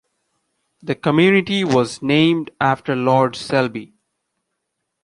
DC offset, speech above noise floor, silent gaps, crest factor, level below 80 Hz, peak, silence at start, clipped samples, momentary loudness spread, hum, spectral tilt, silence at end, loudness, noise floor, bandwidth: under 0.1%; 59 dB; none; 18 dB; -58 dBFS; -2 dBFS; 0.85 s; under 0.1%; 10 LU; none; -6 dB/octave; 1.2 s; -17 LUFS; -76 dBFS; 11.5 kHz